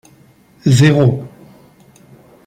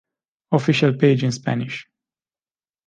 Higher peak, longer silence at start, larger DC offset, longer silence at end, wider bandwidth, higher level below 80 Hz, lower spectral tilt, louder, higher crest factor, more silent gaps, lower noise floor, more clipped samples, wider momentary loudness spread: about the same, -2 dBFS vs -4 dBFS; first, 0.65 s vs 0.5 s; neither; first, 1.2 s vs 1.05 s; first, 13.5 kHz vs 9.2 kHz; first, -50 dBFS vs -64 dBFS; about the same, -6.5 dB/octave vs -6.5 dB/octave; first, -13 LUFS vs -19 LUFS; about the same, 16 dB vs 18 dB; neither; second, -48 dBFS vs under -90 dBFS; neither; first, 17 LU vs 12 LU